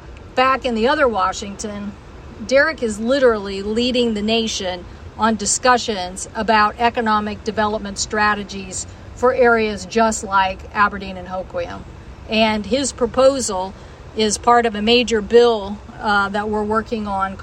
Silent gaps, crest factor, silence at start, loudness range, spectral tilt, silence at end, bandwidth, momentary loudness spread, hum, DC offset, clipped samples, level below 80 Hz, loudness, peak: none; 18 dB; 0 s; 3 LU; -3.5 dB/octave; 0 s; 12.5 kHz; 13 LU; none; under 0.1%; under 0.1%; -40 dBFS; -18 LUFS; -2 dBFS